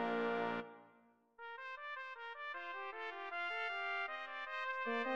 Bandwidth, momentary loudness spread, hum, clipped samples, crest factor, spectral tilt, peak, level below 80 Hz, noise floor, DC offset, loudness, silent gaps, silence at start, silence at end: 8.4 kHz; 10 LU; none; under 0.1%; 16 dB; -5 dB/octave; -26 dBFS; -86 dBFS; -70 dBFS; under 0.1%; -42 LUFS; none; 0 s; 0 s